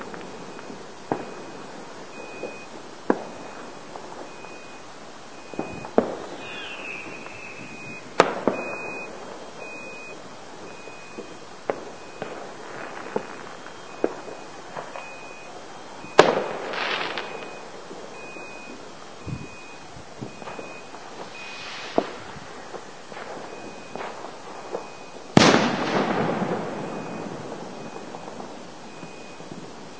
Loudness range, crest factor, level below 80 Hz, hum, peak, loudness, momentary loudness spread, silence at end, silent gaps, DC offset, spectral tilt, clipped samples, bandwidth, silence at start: 13 LU; 30 dB; -60 dBFS; none; 0 dBFS; -29 LUFS; 17 LU; 0 s; none; 0.6%; -4.5 dB/octave; under 0.1%; 8 kHz; 0 s